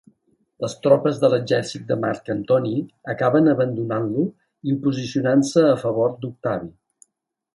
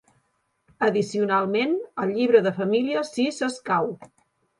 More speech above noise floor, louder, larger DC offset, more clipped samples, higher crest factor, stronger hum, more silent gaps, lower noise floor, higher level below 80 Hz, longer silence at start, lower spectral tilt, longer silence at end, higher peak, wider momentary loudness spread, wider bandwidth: first, 54 dB vs 48 dB; about the same, -21 LUFS vs -23 LUFS; neither; neither; about the same, 18 dB vs 20 dB; neither; neither; first, -75 dBFS vs -71 dBFS; first, -62 dBFS vs -70 dBFS; second, 0.6 s vs 0.8 s; about the same, -6.5 dB/octave vs -5.5 dB/octave; first, 0.85 s vs 0.55 s; about the same, -2 dBFS vs -4 dBFS; first, 11 LU vs 8 LU; about the same, 11.5 kHz vs 11.5 kHz